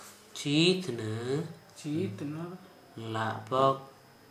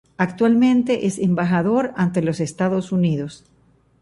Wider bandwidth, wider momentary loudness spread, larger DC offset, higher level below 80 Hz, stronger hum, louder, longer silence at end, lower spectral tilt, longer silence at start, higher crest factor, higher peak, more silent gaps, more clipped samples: first, 15.5 kHz vs 11.5 kHz; first, 18 LU vs 7 LU; neither; second, -78 dBFS vs -56 dBFS; neither; second, -31 LUFS vs -19 LUFS; second, 0.4 s vs 0.65 s; second, -5 dB/octave vs -7 dB/octave; second, 0 s vs 0.2 s; about the same, 20 dB vs 16 dB; second, -12 dBFS vs -4 dBFS; neither; neither